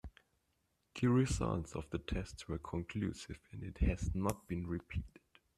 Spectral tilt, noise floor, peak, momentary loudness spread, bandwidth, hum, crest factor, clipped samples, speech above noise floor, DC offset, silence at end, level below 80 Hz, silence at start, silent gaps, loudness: -6.5 dB/octave; -81 dBFS; -20 dBFS; 16 LU; 14 kHz; none; 18 dB; under 0.1%; 43 dB; under 0.1%; 0.5 s; -46 dBFS; 0.05 s; none; -39 LUFS